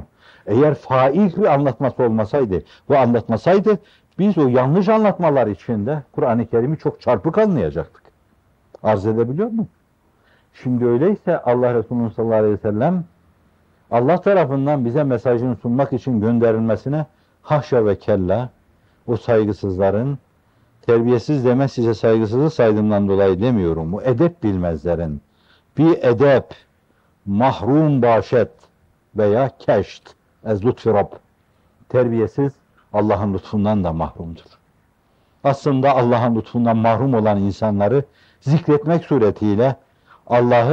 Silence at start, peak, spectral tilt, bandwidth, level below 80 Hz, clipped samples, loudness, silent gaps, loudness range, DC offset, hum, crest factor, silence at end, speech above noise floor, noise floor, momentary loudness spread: 0 s; -4 dBFS; -9 dB/octave; 7.8 kHz; -50 dBFS; under 0.1%; -18 LUFS; none; 4 LU; under 0.1%; none; 14 dB; 0 s; 42 dB; -59 dBFS; 9 LU